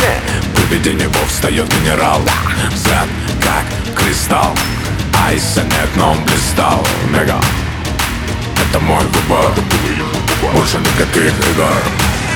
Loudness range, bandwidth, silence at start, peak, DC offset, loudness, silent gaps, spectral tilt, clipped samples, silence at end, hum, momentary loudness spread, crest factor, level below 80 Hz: 1 LU; over 20 kHz; 0 s; 0 dBFS; under 0.1%; -13 LUFS; none; -4 dB/octave; under 0.1%; 0 s; none; 5 LU; 12 dB; -24 dBFS